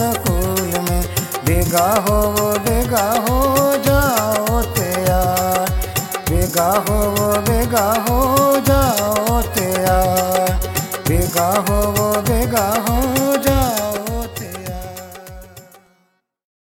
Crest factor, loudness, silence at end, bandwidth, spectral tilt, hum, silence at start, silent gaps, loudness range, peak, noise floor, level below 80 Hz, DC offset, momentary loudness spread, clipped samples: 16 dB; -17 LUFS; 1.1 s; 17 kHz; -4.5 dB/octave; none; 0 s; none; 3 LU; -2 dBFS; -63 dBFS; -26 dBFS; under 0.1%; 7 LU; under 0.1%